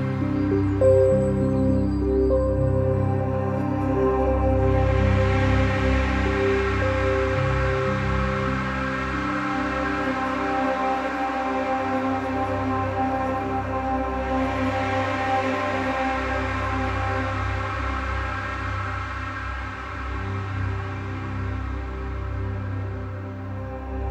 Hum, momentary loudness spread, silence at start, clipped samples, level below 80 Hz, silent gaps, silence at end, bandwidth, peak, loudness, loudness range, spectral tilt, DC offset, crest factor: none; 10 LU; 0 s; under 0.1%; -32 dBFS; none; 0 s; 8.6 kHz; -8 dBFS; -24 LUFS; 8 LU; -7.5 dB/octave; under 0.1%; 16 dB